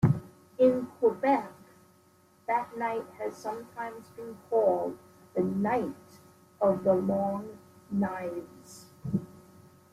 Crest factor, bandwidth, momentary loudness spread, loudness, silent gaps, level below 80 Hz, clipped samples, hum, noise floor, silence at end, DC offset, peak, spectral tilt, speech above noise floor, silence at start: 20 dB; 15 kHz; 20 LU; -30 LUFS; none; -64 dBFS; under 0.1%; none; -62 dBFS; 0.55 s; under 0.1%; -10 dBFS; -8.5 dB/octave; 32 dB; 0 s